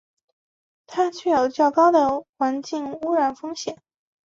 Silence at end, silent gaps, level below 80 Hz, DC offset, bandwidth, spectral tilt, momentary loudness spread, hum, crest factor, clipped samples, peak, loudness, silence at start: 0.55 s; 2.29-2.33 s; -64 dBFS; under 0.1%; 7.8 kHz; -4 dB/octave; 14 LU; none; 16 dB; under 0.1%; -6 dBFS; -22 LUFS; 0.9 s